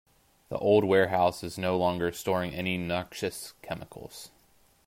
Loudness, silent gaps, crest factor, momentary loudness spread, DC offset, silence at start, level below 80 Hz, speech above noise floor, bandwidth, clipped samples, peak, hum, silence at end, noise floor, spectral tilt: -28 LUFS; none; 20 dB; 20 LU; under 0.1%; 0.5 s; -60 dBFS; 35 dB; 16 kHz; under 0.1%; -10 dBFS; none; 0.6 s; -63 dBFS; -5.5 dB/octave